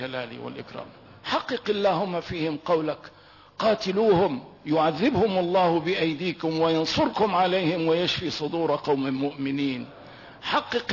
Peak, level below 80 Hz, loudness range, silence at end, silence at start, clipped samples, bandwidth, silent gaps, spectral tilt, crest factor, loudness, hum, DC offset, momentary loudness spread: -10 dBFS; -58 dBFS; 4 LU; 0 s; 0 s; under 0.1%; 6 kHz; none; -6 dB/octave; 14 dB; -25 LUFS; none; under 0.1%; 15 LU